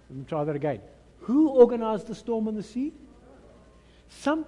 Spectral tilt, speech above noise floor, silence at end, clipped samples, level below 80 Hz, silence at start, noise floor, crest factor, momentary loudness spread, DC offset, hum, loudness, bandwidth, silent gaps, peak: -7.5 dB/octave; 29 dB; 0 s; under 0.1%; -58 dBFS; 0.1 s; -54 dBFS; 22 dB; 15 LU; under 0.1%; none; -26 LUFS; 11 kHz; none; -6 dBFS